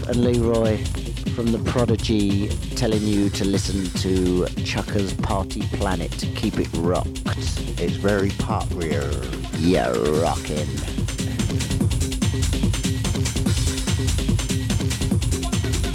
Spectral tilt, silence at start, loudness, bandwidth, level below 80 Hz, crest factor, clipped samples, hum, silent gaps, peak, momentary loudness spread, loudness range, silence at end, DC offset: -5.5 dB/octave; 0 s; -23 LUFS; 16.5 kHz; -30 dBFS; 16 dB; under 0.1%; none; none; -6 dBFS; 5 LU; 2 LU; 0 s; under 0.1%